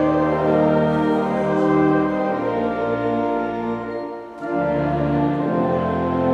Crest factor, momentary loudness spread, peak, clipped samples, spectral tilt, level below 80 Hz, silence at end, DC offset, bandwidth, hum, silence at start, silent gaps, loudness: 14 dB; 9 LU; -6 dBFS; under 0.1%; -9 dB/octave; -44 dBFS; 0 s; under 0.1%; 7.2 kHz; none; 0 s; none; -20 LUFS